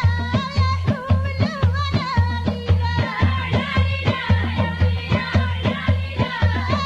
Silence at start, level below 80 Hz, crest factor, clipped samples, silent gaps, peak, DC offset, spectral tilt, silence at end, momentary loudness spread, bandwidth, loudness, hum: 0 s; -32 dBFS; 16 dB; under 0.1%; none; -4 dBFS; under 0.1%; -7 dB/octave; 0 s; 2 LU; 7.2 kHz; -21 LUFS; none